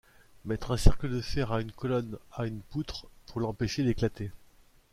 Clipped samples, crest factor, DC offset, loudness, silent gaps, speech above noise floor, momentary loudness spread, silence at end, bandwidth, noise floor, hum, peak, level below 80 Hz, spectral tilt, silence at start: under 0.1%; 24 dB; under 0.1%; -32 LUFS; none; 31 dB; 13 LU; 0.55 s; 13.5 kHz; -59 dBFS; none; -6 dBFS; -36 dBFS; -6.5 dB/octave; 0.45 s